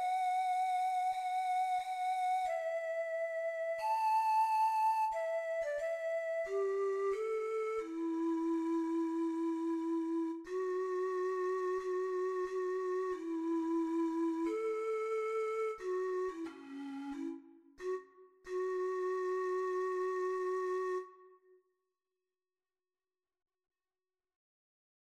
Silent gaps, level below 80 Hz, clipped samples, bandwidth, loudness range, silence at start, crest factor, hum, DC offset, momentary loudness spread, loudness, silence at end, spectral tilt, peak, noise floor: none; -78 dBFS; under 0.1%; 14 kHz; 7 LU; 0 s; 12 dB; none; under 0.1%; 7 LU; -36 LUFS; 3.7 s; -3.5 dB/octave; -24 dBFS; under -90 dBFS